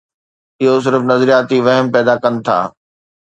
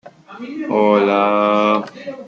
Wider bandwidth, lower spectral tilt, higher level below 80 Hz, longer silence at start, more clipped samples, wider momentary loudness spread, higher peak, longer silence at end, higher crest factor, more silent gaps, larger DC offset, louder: first, 8.8 kHz vs 7.2 kHz; about the same, -6.5 dB/octave vs -7 dB/octave; first, -60 dBFS vs -68 dBFS; first, 0.6 s vs 0.05 s; neither; second, 6 LU vs 17 LU; about the same, 0 dBFS vs -2 dBFS; first, 0.55 s vs 0 s; about the same, 14 dB vs 14 dB; neither; neither; about the same, -13 LUFS vs -15 LUFS